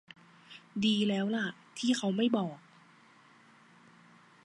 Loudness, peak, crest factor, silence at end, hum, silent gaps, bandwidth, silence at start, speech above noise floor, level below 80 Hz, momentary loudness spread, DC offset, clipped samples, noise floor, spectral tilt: -31 LUFS; -14 dBFS; 20 dB; 1.9 s; none; none; 11.5 kHz; 0.5 s; 30 dB; -78 dBFS; 21 LU; under 0.1%; under 0.1%; -60 dBFS; -5 dB/octave